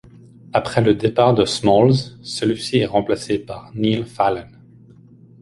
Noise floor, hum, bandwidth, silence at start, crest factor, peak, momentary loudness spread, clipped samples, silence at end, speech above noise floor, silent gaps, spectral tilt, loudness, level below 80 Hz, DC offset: -46 dBFS; none; 11.5 kHz; 0.55 s; 18 dB; -2 dBFS; 10 LU; under 0.1%; 0.95 s; 28 dB; none; -6 dB/octave; -18 LUFS; -48 dBFS; under 0.1%